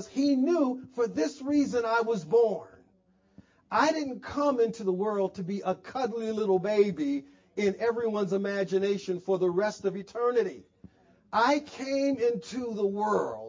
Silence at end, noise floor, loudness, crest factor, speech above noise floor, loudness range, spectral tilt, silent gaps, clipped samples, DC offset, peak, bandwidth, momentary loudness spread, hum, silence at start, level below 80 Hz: 0 s; -66 dBFS; -28 LUFS; 18 dB; 39 dB; 1 LU; -6 dB/octave; none; under 0.1%; under 0.1%; -10 dBFS; 7.6 kHz; 7 LU; none; 0 s; -68 dBFS